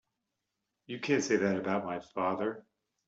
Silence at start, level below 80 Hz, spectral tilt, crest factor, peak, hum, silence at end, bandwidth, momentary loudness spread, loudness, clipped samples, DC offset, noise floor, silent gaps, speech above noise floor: 0.9 s; -74 dBFS; -5 dB/octave; 20 dB; -14 dBFS; none; 0.45 s; 8 kHz; 11 LU; -32 LUFS; under 0.1%; under 0.1%; -86 dBFS; none; 54 dB